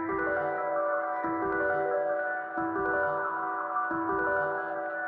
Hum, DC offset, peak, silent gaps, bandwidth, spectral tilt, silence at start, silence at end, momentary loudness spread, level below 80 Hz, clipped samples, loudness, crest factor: none; under 0.1%; -18 dBFS; none; 4.4 kHz; -9.5 dB/octave; 0 s; 0 s; 4 LU; -62 dBFS; under 0.1%; -30 LUFS; 12 dB